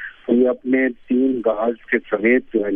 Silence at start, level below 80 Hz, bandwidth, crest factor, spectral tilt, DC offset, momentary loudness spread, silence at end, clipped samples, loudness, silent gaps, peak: 0 s; -54 dBFS; 3.6 kHz; 16 dB; -9.5 dB/octave; under 0.1%; 4 LU; 0 s; under 0.1%; -19 LUFS; none; -2 dBFS